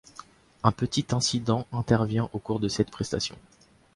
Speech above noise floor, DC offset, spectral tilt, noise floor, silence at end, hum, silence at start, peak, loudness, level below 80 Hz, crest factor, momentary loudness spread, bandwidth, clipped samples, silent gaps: 23 dB; under 0.1%; -5 dB/octave; -50 dBFS; 0.55 s; none; 0.2 s; -4 dBFS; -27 LUFS; -52 dBFS; 24 dB; 6 LU; 11.5 kHz; under 0.1%; none